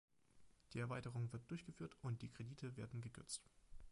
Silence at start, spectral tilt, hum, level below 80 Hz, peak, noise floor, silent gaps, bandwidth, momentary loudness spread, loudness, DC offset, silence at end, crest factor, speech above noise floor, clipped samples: 0.35 s; -5.5 dB/octave; none; -70 dBFS; -34 dBFS; -71 dBFS; none; 11 kHz; 6 LU; -51 LUFS; under 0.1%; 0 s; 16 dB; 21 dB; under 0.1%